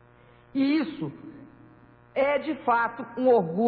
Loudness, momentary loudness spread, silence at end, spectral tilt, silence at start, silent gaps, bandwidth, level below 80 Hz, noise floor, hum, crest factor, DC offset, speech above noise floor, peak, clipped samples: -26 LUFS; 14 LU; 0 s; -9.5 dB/octave; 0.55 s; none; 4.9 kHz; -66 dBFS; -55 dBFS; none; 16 dB; under 0.1%; 30 dB; -10 dBFS; under 0.1%